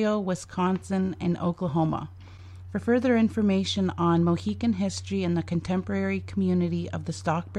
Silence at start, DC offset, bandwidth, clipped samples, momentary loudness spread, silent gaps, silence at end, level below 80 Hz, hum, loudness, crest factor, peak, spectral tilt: 0 s; under 0.1%; 10 kHz; under 0.1%; 9 LU; none; 0 s; -54 dBFS; none; -27 LUFS; 16 dB; -10 dBFS; -6.5 dB/octave